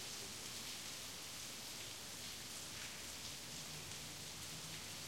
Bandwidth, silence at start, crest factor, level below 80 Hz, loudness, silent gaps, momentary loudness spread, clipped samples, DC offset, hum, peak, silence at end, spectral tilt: 16.5 kHz; 0 s; 16 dB; -70 dBFS; -47 LUFS; none; 1 LU; under 0.1%; under 0.1%; none; -32 dBFS; 0 s; -1 dB/octave